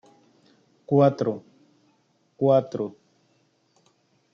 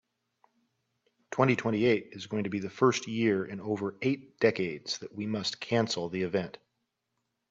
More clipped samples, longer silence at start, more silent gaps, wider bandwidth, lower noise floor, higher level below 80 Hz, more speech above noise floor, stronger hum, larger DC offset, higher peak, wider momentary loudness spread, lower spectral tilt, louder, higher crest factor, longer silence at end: neither; second, 0.9 s vs 1.3 s; neither; second, 6.8 kHz vs 8 kHz; second, -66 dBFS vs -82 dBFS; about the same, -76 dBFS vs -72 dBFS; second, 45 dB vs 52 dB; neither; neither; about the same, -8 dBFS vs -8 dBFS; first, 13 LU vs 8 LU; first, -9 dB/octave vs -5.5 dB/octave; first, -23 LUFS vs -30 LUFS; about the same, 20 dB vs 24 dB; first, 1.45 s vs 1 s